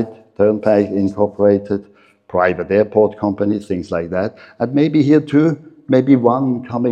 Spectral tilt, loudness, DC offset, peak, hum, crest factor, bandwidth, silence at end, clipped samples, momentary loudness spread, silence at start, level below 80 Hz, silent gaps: -9 dB/octave; -16 LUFS; under 0.1%; 0 dBFS; none; 16 dB; 8.4 kHz; 0 s; under 0.1%; 10 LU; 0 s; -58 dBFS; none